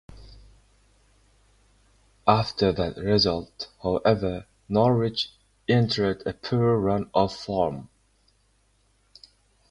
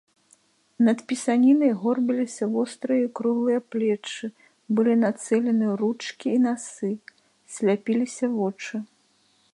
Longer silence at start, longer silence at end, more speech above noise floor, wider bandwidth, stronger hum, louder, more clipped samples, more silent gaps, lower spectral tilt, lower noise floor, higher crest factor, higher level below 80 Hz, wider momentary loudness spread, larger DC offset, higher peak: second, 0.15 s vs 0.8 s; first, 1.85 s vs 0.7 s; about the same, 42 dB vs 41 dB; about the same, 11 kHz vs 11.5 kHz; neither; about the same, -25 LUFS vs -24 LUFS; neither; neither; first, -7 dB/octave vs -5.5 dB/octave; about the same, -65 dBFS vs -64 dBFS; first, 24 dB vs 14 dB; first, -50 dBFS vs -78 dBFS; second, 10 LU vs 13 LU; neither; first, -2 dBFS vs -10 dBFS